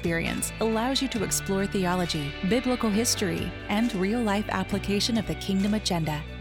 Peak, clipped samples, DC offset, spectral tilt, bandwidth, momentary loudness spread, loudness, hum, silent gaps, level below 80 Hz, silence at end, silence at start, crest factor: -12 dBFS; under 0.1%; under 0.1%; -4 dB/octave; 19 kHz; 4 LU; -26 LUFS; none; none; -42 dBFS; 0 s; 0 s; 16 dB